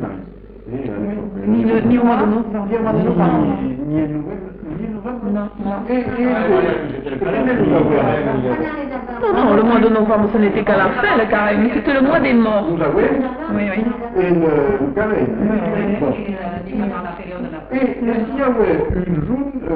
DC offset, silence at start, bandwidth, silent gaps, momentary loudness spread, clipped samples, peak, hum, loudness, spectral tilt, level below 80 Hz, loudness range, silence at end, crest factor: under 0.1%; 0 s; 4.9 kHz; none; 11 LU; under 0.1%; -2 dBFS; none; -17 LUFS; -12 dB/octave; -38 dBFS; 5 LU; 0 s; 14 dB